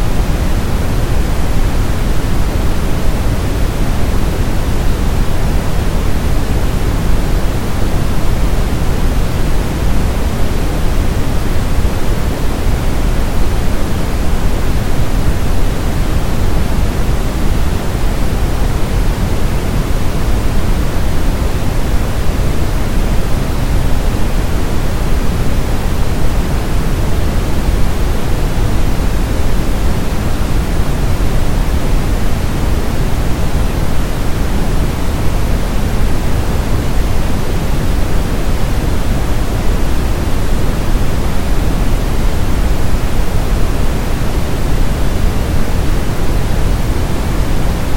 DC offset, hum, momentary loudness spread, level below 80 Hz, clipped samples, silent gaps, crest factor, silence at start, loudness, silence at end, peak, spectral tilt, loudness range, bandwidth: under 0.1%; none; 1 LU; -14 dBFS; under 0.1%; none; 10 dB; 0 s; -17 LUFS; 0 s; 0 dBFS; -6 dB/octave; 0 LU; 17 kHz